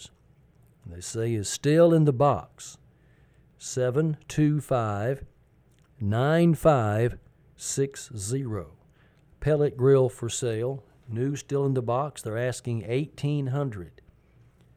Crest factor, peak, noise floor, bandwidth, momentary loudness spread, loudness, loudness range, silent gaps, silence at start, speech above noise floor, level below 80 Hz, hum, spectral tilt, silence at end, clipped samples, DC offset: 18 dB; -8 dBFS; -60 dBFS; 14.5 kHz; 16 LU; -26 LUFS; 4 LU; none; 0 s; 35 dB; -54 dBFS; none; -6.5 dB/octave; 0.9 s; under 0.1%; under 0.1%